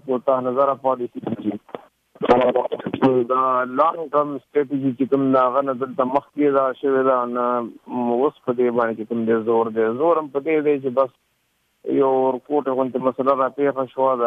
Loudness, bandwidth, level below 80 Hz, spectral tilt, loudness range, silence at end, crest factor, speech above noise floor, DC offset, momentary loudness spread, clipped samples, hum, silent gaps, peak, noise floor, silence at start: -20 LUFS; 5.4 kHz; -60 dBFS; -8.5 dB/octave; 2 LU; 0 s; 16 dB; 48 dB; under 0.1%; 8 LU; under 0.1%; none; none; -4 dBFS; -68 dBFS; 0.05 s